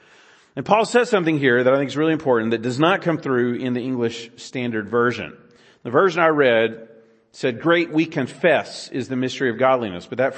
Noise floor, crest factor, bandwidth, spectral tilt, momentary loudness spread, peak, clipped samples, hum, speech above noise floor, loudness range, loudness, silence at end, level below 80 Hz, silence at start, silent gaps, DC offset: -52 dBFS; 18 dB; 8.8 kHz; -5.5 dB/octave; 12 LU; -2 dBFS; under 0.1%; none; 32 dB; 3 LU; -20 LUFS; 0 s; -66 dBFS; 0.55 s; none; under 0.1%